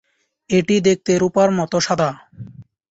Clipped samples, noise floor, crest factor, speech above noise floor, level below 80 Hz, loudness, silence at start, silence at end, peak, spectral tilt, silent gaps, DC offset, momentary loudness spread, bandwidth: under 0.1%; -38 dBFS; 16 dB; 22 dB; -54 dBFS; -17 LUFS; 0.5 s; 0.3 s; -2 dBFS; -5 dB/octave; none; under 0.1%; 22 LU; 8 kHz